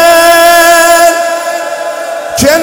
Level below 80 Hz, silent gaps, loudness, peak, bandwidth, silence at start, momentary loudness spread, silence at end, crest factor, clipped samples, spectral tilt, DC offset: -40 dBFS; none; -6 LUFS; 0 dBFS; over 20 kHz; 0 s; 13 LU; 0 s; 6 dB; 10%; -2 dB/octave; under 0.1%